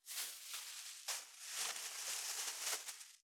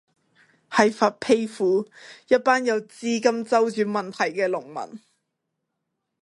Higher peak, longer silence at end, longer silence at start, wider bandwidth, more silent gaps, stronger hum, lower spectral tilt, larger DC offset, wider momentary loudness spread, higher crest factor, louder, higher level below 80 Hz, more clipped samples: second, -26 dBFS vs -2 dBFS; second, 0.25 s vs 1.25 s; second, 0.05 s vs 0.7 s; first, over 20 kHz vs 11.5 kHz; neither; neither; second, 4 dB/octave vs -4.5 dB/octave; neither; second, 6 LU vs 10 LU; about the same, 22 dB vs 22 dB; second, -43 LUFS vs -23 LUFS; second, under -90 dBFS vs -72 dBFS; neither